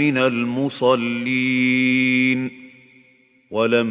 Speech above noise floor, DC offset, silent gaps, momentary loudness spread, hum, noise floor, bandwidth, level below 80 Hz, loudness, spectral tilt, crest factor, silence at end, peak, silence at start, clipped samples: 37 dB; under 0.1%; none; 7 LU; none; -56 dBFS; 4 kHz; -64 dBFS; -19 LUFS; -9.5 dB/octave; 16 dB; 0 s; -4 dBFS; 0 s; under 0.1%